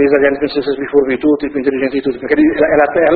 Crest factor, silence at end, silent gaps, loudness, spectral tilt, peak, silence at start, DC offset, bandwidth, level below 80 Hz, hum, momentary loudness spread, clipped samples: 12 dB; 0 s; none; -14 LUFS; -9 dB/octave; 0 dBFS; 0 s; under 0.1%; 4.8 kHz; -44 dBFS; none; 6 LU; under 0.1%